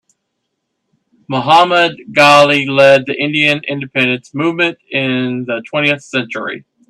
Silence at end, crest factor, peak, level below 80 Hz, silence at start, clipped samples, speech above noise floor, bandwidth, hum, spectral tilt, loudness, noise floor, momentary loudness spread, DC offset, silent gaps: 0.3 s; 14 dB; 0 dBFS; -58 dBFS; 1.3 s; under 0.1%; 59 dB; 13 kHz; none; -4.5 dB/octave; -12 LUFS; -71 dBFS; 11 LU; under 0.1%; none